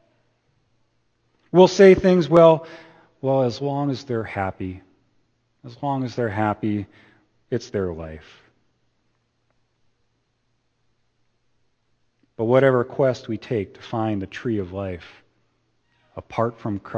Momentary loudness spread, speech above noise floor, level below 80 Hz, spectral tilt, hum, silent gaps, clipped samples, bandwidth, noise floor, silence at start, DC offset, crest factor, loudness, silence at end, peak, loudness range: 20 LU; 50 dB; -54 dBFS; -7 dB/octave; none; none; under 0.1%; 7.4 kHz; -70 dBFS; 1.55 s; under 0.1%; 22 dB; -21 LUFS; 0 s; 0 dBFS; 15 LU